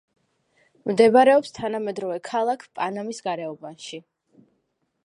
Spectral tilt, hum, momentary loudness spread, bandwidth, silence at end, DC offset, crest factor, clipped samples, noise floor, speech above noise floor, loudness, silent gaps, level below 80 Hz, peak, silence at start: -5 dB/octave; none; 21 LU; 11 kHz; 1.05 s; under 0.1%; 20 dB; under 0.1%; -73 dBFS; 51 dB; -22 LUFS; none; -68 dBFS; -4 dBFS; 0.85 s